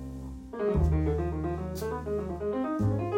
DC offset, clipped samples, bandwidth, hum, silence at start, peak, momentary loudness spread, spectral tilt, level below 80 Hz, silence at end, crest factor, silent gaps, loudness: under 0.1%; under 0.1%; 16.5 kHz; none; 0 s; -16 dBFS; 9 LU; -8.5 dB/octave; -36 dBFS; 0 s; 14 dB; none; -31 LUFS